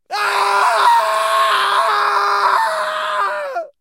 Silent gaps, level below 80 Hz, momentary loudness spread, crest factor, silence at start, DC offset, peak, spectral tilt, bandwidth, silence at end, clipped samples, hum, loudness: none; -78 dBFS; 7 LU; 14 dB; 0.1 s; under 0.1%; -2 dBFS; 0.5 dB/octave; 16 kHz; 0.1 s; under 0.1%; none; -15 LUFS